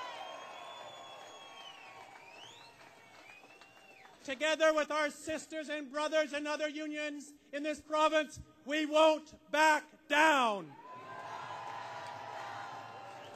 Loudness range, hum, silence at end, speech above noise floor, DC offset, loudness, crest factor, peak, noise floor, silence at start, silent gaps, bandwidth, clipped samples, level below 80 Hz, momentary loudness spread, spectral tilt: 19 LU; none; 0 s; 26 dB; under 0.1%; -33 LUFS; 22 dB; -14 dBFS; -58 dBFS; 0 s; none; 15 kHz; under 0.1%; -72 dBFS; 23 LU; -2.5 dB/octave